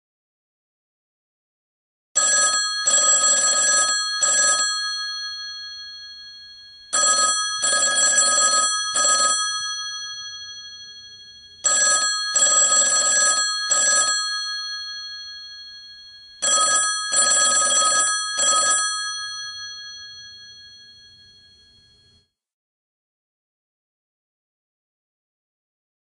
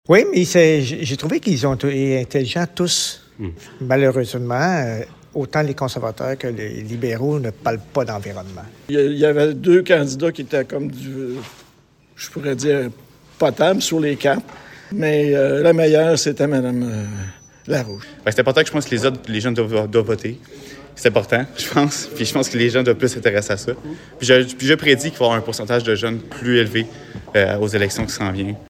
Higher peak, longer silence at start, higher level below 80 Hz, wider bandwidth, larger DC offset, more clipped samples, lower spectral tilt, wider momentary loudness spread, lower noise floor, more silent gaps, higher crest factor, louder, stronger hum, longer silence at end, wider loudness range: second, -6 dBFS vs 0 dBFS; first, 2.15 s vs 0.1 s; second, -66 dBFS vs -52 dBFS; second, 10.5 kHz vs 16.5 kHz; neither; neither; second, 3 dB/octave vs -5 dB/octave; first, 20 LU vs 15 LU; first, -61 dBFS vs -53 dBFS; neither; about the same, 18 dB vs 18 dB; about the same, -17 LUFS vs -18 LUFS; neither; first, 5.3 s vs 0.05 s; about the same, 6 LU vs 5 LU